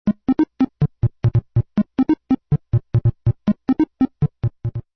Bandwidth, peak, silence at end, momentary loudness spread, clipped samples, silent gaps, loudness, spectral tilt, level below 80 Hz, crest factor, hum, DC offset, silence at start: 5.6 kHz; -6 dBFS; 0.15 s; 3 LU; under 0.1%; none; -21 LUFS; -11 dB/octave; -38 dBFS; 12 dB; none; under 0.1%; 0.05 s